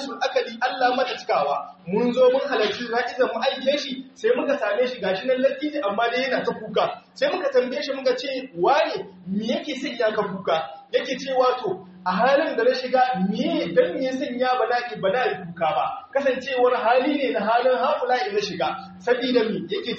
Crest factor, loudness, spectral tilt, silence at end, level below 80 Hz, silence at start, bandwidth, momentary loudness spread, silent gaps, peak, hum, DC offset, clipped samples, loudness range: 16 dB; -23 LUFS; -2.5 dB/octave; 0 s; -68 dBFS; 0 s; 7.2 kHz; 7 LU; none; -6 dBFS; none; under 0.1%; under 0.1%; 2 LU